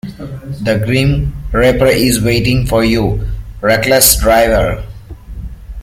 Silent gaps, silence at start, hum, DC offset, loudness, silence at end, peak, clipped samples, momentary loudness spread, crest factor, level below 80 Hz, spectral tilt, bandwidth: none; 0.05 s; none; under 0.1%; -12 LUFS; 0 s; 0 dBFS; under 0.1%; 21 LU; 12 dB; -24 dBFS; -4.5 dB/octave; 17 kHz